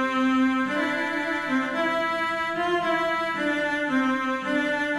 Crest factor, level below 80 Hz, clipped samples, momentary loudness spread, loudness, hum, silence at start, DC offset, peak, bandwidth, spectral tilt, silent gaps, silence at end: 12 dB; -62 dBFS; under 0.1%; 3 LU; -24 LUFS; none; 0 s; under 0.1%; -12 dBFS; 12.5 kHz; -4.5 dB/octave; none; 0 s